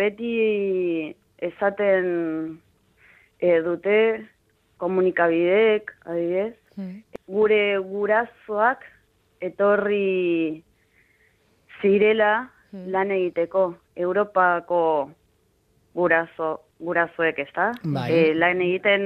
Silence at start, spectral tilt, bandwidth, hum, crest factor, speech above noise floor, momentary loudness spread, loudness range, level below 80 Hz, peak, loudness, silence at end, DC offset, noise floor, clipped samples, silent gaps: 0 s; -8 dB/octave; 5.6 kHz; none; 18 dB; 43 dB; 14 LU; 3 LU; -66 dBFS; -4 dBFS; -22 LUFS; 0 s; under 0.1%; -64 dBFS; under 0.1%; none